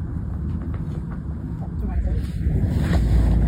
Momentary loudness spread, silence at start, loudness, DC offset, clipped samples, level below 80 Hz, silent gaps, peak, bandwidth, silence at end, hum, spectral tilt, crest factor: 10 LU; 0 s; -25 LUFS; under 0.1%; under 0.1%; -24 dBFS; none; -8 dBFS; 9.2 kHz; 0 s; none; -8.5 dB/octave; 14 dB